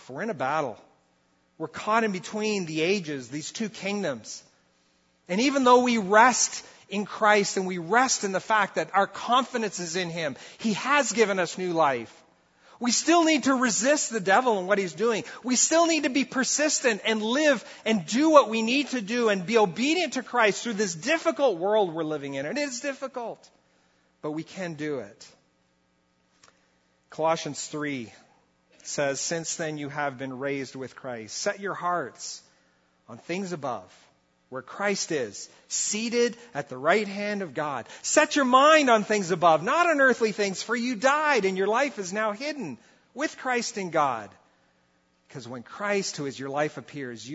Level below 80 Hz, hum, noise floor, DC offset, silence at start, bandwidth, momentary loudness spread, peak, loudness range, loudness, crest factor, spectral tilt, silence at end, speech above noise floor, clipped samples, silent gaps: -76 dBFS; none; -69 dBFS; under 0.1%; 0.1 s; 8.2 kHz; 16 LU; -4 dBFS; 12 LU; -25 LUFS; 24 dB; -3 dB/octave; 0 s; 43 dB; under 0.1%; none